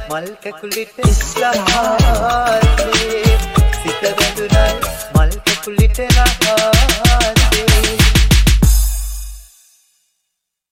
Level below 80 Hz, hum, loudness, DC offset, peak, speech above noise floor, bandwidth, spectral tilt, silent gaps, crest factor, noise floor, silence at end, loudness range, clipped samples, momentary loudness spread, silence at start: -16 dBFS; none; -14 LUFS; under 0.1%; 0 dBFS; 61 dB; 16.5 kHz; -4 dB/octave; none; 14 dB; -75 dBFS; 1.3 s; 3 LU; under 0.1%; 11 LU; 0 s